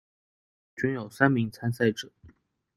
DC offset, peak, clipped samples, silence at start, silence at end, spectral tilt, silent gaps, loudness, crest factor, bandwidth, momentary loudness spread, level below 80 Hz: under 0.1%; -4 dBFS; under 0.1%; 0.75 s; 0.5 s; -6.5 dB/octave; none; -27 LUFS; 24 dB; 14 kHz; 17 LU; -64 dBFS